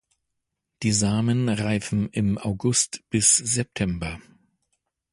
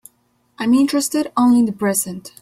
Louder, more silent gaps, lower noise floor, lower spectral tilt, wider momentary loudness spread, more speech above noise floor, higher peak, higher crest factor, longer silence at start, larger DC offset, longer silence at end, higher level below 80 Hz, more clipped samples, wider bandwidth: second, -23 LUFS vs -17 LUFS; neither; first, -80 dBFS vs -62 dBFS; about the same, -4 dB/octave vs -4 dB/octave; about the same, 10 LU vs 8 LU; first, 57 dB vs 45 dB; about the same, -6 dBFS vs -4 dBFS; first, 20 dB vs 14 dB; first, 0.8 s vs 0.6 s; neither; first, 0.9 s vs 0.15 s; first, -48 dBFS vs -60 dBFS; neither; second, 11.5 kHz vs 16.5 kHz